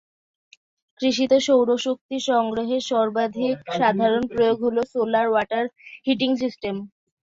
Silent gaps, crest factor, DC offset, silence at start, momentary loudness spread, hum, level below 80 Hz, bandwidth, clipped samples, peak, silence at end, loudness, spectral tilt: 2.01-2.09 s; 16 dB; under 0.1%; 1 s; 8 LU; none; -62 dBFS; 7.8 kHz; under 0.1%; -6 dBFS; 0.5 s; -22 LUFS; -4.5 dB/octave